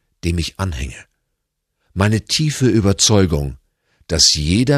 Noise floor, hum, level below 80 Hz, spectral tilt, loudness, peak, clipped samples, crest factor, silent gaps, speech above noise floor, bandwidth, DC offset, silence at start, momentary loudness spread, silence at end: -74 dBFS; none; -32 dBFS; -4 dB/octave; -16 LUFS; 0 dBFS; under 0.1%; 18 dB; none; 58 dB; 14 kHz; under 0.1%; 0.25 s; 15 LU; 0 s